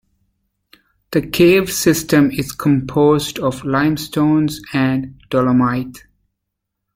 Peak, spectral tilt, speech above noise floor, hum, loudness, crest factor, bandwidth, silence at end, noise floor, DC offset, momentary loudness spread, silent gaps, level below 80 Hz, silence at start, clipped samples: 0 dBFS; -5.5 dB/octave; 62 dB; none; -16 LUFS; 16 dB; 16.5 kHz; 0.95 s; -77 dBFS; under 0.1%; 8 LU; none; -46 dBFS; 1.1 s; under 0.1%